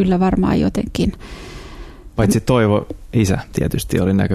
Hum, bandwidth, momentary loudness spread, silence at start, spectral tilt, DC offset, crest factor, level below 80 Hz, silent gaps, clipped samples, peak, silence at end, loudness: none; 14 kHz; 19 LU; 0 s; -6.5 dB/octave; under 0.1%; 16 dB; -32 dBFS; none; under 0.1%; -2 dBFS; 0 s; -18 LUFS